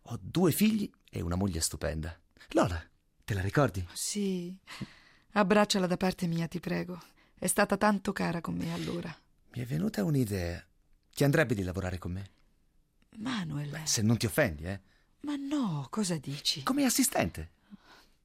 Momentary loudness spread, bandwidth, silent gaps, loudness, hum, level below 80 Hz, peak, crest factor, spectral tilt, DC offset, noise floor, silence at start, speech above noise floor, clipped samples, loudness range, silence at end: 17 LU; 16 kHz; none; -31 LUFS; none; -56 dBFS; -10 dBFS; 20 dB; -4.5 dB/octave; under 0.1%; -68 dBFS; 0.05 s; 37 dB; under 0.1%; 3 LU; 0.5 s